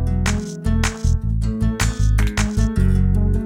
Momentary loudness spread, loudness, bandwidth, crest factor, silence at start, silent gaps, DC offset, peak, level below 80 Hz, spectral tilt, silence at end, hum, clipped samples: 4 LU; -20 LUFS; 15 kHz; 14 dB; 0 s; none; under 0.1%; -4 dBFS; -20 dBFS; -5.5 dB/octave; 0 s; none; under 0.1%